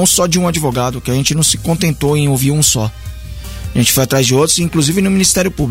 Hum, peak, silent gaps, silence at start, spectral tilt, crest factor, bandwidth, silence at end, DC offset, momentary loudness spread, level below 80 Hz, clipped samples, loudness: none; 0 dBFS; none; 0 s; -4 dB/octave; 12 dB; 16.5 kHz; 0 s; under 0.1%; 11 LU; -32 dBFS; under 0.1%; -13 LUFS